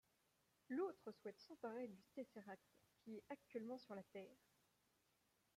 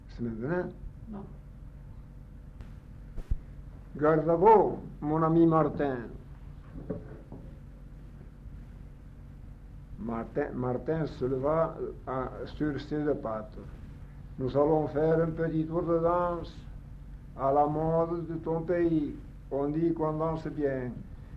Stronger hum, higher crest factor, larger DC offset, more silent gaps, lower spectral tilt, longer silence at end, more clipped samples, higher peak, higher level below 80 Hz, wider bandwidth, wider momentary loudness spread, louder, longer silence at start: neither; about the same, 18 dB vs 22 dB; neither; neither; second, -6.5 dB/octave vs -10 dB/octave; first, 1.2 s vs 0 s; neither; second, -36 dBFS vs -10 dBFS; second, under -90 dBFS vs -46 dBFS; first, 15.5 kHz vs 6.2 kHz; second, 12 LU vs 23 LU; second, -54 LUFS vs -29 LUFS; first, 0.7 s vs 0 s